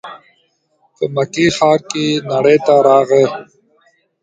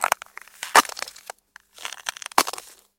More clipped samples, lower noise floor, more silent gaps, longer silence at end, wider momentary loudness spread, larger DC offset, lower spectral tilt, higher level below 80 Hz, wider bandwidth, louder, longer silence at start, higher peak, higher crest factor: neither; first, -60 dBFS vs -51 dBFS; neither; first, 0.8 s vs 0.4 s; second, 11 LU vs 22 LU; neither; first, -5 dB/octave vs 0.5 dB/octave; first, -56 dBFS vs -66 dBFS; second, 9.2 kHz vs 17 kHz; first, -13 LUFS vs -23 LUFS; about the same, 0.05 s vs 0 s; about the same, 0 dBFS vs 0 dBFS; second, 14 dB vs 26 dB